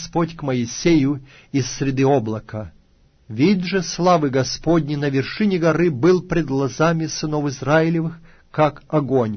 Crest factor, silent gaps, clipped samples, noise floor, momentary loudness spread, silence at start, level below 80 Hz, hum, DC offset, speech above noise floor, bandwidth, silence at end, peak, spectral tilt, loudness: 16 dB; none; under 0.1%; -55 dBFS; 9 LU; 0 s; -44 dBFS; none; under 0.1%; 36 dB; 6.6 kHz; 0 s; -4 dBFS; -6 dB/octave; -20 LUFS